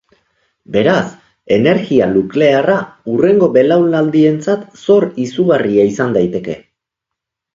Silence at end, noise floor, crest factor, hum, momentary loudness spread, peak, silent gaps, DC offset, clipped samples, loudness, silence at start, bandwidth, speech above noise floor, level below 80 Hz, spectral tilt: 1 s; -80 dBFS; 14 dB; none; 8 LU; 0 dBFS; none; under 0.1%; under 0.1%; -13 LUFS; 0.7 s; 7.6 kHz; 68 dB; -52 dBFS; -7 dB/octave